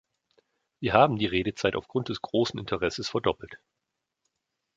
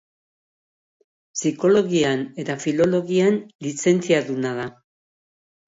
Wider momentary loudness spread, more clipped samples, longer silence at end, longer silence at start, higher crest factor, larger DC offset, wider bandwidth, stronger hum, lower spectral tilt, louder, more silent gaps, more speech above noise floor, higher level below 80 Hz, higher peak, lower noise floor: about the same, 10 LU vs 11 LU; neither; first, 1.2 s vs 0.95 s; second, 0.8 s vs 1.35 s; first, 26 dB vs 18 dB; neither; about the same, 7.8 kHz vs 8 kHz; neither; about the same, -5.5 dB/octave vs -5 dB/octave; second, -27 LUFS vs -21 LUFS; second, none vs 3.55-3.59 s; second, 57 dB vs over 70 dB; first, -54 dBFS vs -64 dBFS; about the same, -4 dBFS vs -4 dBFS; second, -84 dBFS vs under -90 dBFS